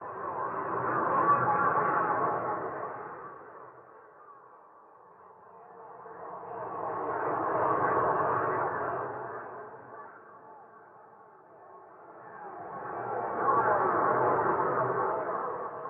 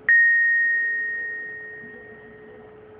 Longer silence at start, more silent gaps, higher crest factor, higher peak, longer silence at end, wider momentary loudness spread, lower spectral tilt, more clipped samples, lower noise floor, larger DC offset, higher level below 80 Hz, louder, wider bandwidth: about the same, 0 s vs 0.1 s; neither; about the same, 18 dB vs 14 dB; second, -14 dBFS vs -8 dBFS; about the same, 0 s vs 0.05 s; about the same, 23 LU vs 23 LU; first, -11 dB/octave vs -6.5 dB/octave; neither; first, -55 dBFS vs -45 dBFS; neither; about the same, -70 dBFS vs -68 dBFS; second, -30 LUFS vs -19 LUFS; about the same, 3.4 kHz vs 3.7 kHz